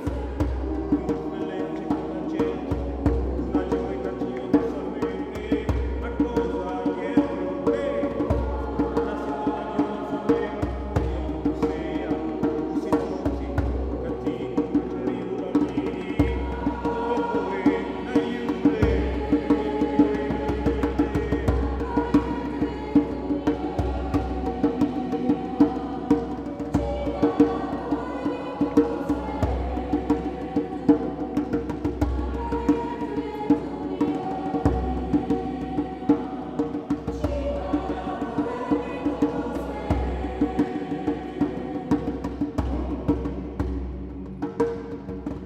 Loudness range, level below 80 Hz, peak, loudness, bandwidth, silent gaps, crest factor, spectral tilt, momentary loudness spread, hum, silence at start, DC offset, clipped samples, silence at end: 3 LU; -34 dBFS; -6 dBFS; -26 LUFS; 8.6 kHz; none; 20 dB; -8.5 dB/octave; 6 LU; none; 0 s; under 0.1%; under 0.1%; 0 s